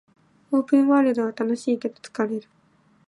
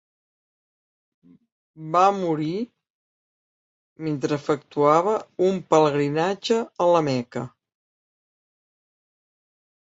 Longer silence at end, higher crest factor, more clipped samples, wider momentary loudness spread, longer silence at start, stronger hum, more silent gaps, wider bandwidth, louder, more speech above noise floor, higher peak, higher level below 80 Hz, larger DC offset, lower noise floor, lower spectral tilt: second, 0.65 s vs 2.4 s; about the same, 16 dB vs 20 dB; neither; second, 10 LU vs 14 LU; second, 0.5 s vs 1.8 s; neither; second, none vs 2.90-3.96 s; first, 11 kHz vs 8 kHz; about the same, -23 LUFS vs -22 LUFS; second, 39 dB vs over 68 dB; second, -8 dBFS vs -4 dBFS; second, -78 dBFS vs -70 dBFS; neither; second, -60 dBFS vs under -90 dBFS; about the same, -6 dB/octave vs -6 dB/octave